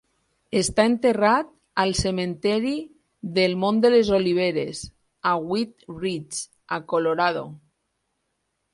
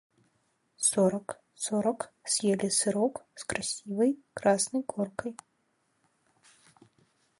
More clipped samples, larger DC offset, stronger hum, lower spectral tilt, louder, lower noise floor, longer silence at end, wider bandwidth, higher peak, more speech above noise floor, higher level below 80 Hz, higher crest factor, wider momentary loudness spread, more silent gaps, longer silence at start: neither; neither; neither; about the same, -4.5 dB/octave vs -3.5 dB/octave; first, -23 LUFS vs -29 LUFS; about the same, -76 dBFS vs -74 dBFS; second, 1.15 s vs 2.05 s; about the same, 11.5 kHz vs 11.5 kHz; first, -6 dBFS vs -12 dBFS; first, 53 dB vs 45 dB; first, -50 dBFS vs -68 dBFS; about the same, 18 dB vs 20 dB; about the same, 13 LU vs 12 LU; neither; second, 0.5 s vs 0.8 s